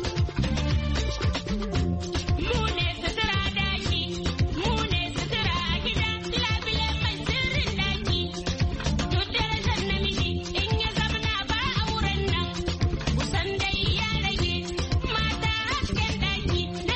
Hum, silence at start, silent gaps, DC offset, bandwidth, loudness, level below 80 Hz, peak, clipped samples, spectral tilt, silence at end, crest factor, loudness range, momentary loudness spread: none; 0 s; none; under 0.1%; 8.4 kHz; -26 LUFS; -32 dBFS; -12 dBFS; under 0.1%; -5 dB/octave; 0 s; 14 dB; 1 LU; 3 LU